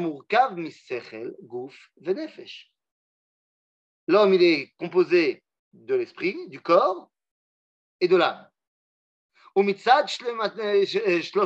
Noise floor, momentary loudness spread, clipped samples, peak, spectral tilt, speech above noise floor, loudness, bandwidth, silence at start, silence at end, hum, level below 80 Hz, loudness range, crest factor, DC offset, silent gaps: under -90 dBFS; 18 LU; under 0.1%; -4 dBFS; -5.5 dB/octave; over 67 dB; -23 LUFS; 8 kHz; 0 s; 0 s; none; -86 dBFS; 7 LU; 20 dB; under 0.1%; 2.91-4.07 s, 5.59-5.71 s, 7.31-7.99 s, 8.67-9.29 s